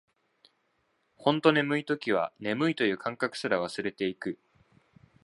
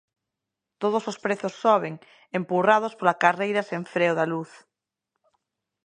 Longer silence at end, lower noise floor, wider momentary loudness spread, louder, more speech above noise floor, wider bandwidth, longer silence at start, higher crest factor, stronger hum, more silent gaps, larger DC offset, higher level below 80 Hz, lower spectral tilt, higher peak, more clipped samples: second, 0.9 s vs 1.4 s; second, -74 dBFS vs -86 dBFS; second, 9 LU vs 12 LU; second, -29 LUFS vs -24 LUFS; second, 45 dB vs 61 dB; first, 11.5 kHz vs 10 kHz; first, 1.2 s vs 0.8 s; about the same, 24 dB vs 24 dB; neither; neither; neither; first, -72 dBFS vs -78 dBFS; about the same, -5.5 dB/octave vs -5.5 dB/octave; second, -6 dBFS vs -2 dBFS; neither